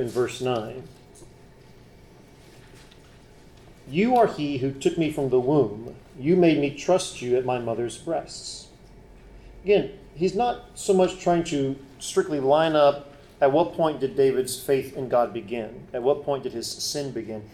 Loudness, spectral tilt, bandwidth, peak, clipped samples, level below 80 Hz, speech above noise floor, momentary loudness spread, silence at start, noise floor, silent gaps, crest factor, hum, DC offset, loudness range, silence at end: -24 LUFS; -5.5 dB/octave; 15 kHz; -8 dBFS; under 0.1%; -54 dBFS; 26 dB; 13 LU; 0 s; -50 dBFS; none; 18 dB; none; under 0.1%; 5 LU; 0.05 s